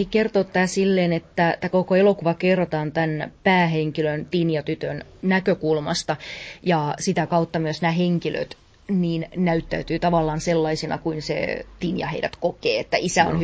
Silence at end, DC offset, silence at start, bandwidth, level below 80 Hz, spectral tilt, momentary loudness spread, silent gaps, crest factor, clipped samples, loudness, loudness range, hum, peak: 0 s; under 0.1%; 0 s; 8 kHz; -48 dBFS; -5.5 dB/octave; 8 LU; none; 18 dB; under 0.1%; -22 LUFS; 3 LU; none; -4 dBFS